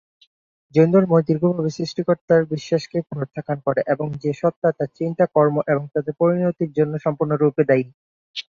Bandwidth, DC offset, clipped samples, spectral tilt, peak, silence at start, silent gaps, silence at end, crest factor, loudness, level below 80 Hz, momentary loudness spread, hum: 7.4 kHz; under 0.1%; under 0.1%; -8 dB/octave; -2 dBFS; 0.75 s; 2.21-2.28 s, 4.56-4.62 s, 7.94-8.34 s; 0.1 s; 18 dB; -20 LUFS; -62 dBFS; 9 LU; none